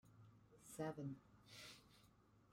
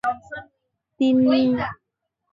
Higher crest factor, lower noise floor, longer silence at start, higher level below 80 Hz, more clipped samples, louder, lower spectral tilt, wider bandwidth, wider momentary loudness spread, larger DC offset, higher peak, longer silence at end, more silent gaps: first, 20 dB vs 14 dB; second, -73 dBFS vs -79 dBFS; about the same, 0.05 s vs 0.05 s; second, -82 dBFS vs -56 dBFS; neither; second, -54 LUFS vs -20 LUFS; second, -5.5 dB/octave vs -7 dB/octave; first, 16 kHz vs 7.2 kHz; about the same, 20 LU vs 19 LU; neither; second, -36 dBFS vs -8 dBFS; second, 0 s vs 0.6 s; neither